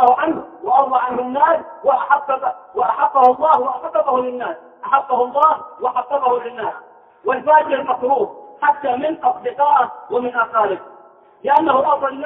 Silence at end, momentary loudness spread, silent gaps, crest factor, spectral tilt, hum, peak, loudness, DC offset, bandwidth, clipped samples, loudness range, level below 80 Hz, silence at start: 0 s; 11 LU; none; 18 dB; -7 dB/octave; none; 0 dBFS; -17 LUFS; under 0.1%; 4.4 kHz; under 0.1%; 3 LU; -64 dBFS; 0 s